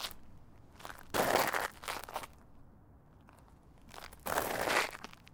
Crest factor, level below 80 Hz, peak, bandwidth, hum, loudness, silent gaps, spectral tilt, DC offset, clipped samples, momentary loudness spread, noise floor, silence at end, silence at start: 24 dB; -60 dBFS; -14 dBFS; 19 kHz; none; -35 LUFS; none; -2.5 dB/octave; under 0.1%; under 0.1%; 21 LU; -59 dBFS; 0.2 s; 0 s